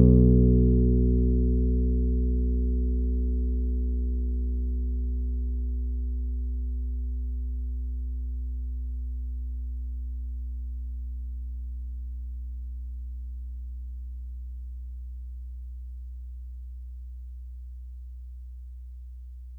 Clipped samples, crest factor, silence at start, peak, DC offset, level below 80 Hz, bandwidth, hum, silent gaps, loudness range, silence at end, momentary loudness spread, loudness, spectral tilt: under 0.1%; 18 dB; 0 s; -8 dBFS; under 0.1%; -28 dBFS; 0.8 kHz; none; none; 15 LU; 0 s; 19 LU; -29 LUFS; -14.5 dB/octave